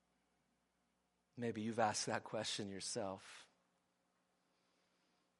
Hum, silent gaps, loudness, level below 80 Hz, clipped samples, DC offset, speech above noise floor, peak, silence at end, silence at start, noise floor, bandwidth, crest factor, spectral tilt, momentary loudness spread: 60 Hz at -70 dBFS; none; -42 LUFS; -88 dBFS; under 0.1%; under 0.1%; 41 dB; -22 dBFS; 1.95 s; 1.35 s; -84 dBFS; 11.5 kHz; 26 dB; -3.5 dB/octave; 18 LU